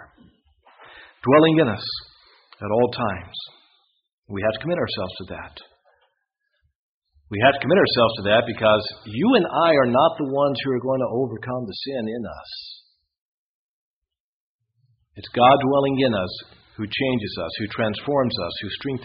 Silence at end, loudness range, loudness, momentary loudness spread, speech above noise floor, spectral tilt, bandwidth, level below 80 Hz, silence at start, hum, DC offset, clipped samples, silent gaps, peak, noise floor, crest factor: 0 s; 11 LU; -21 LUFS; 18 LU; 53 dB; -4 dB/octave; 5.4 kHz; -56 dBFS; 0 s; none; under 0.1%; under 0.1%; 4.13-4.22 s, 6.75-7.02 s, 13.18-14.02 s, 14.20-14.59 s; -2 dBFS; -74 dBFS; 20 dB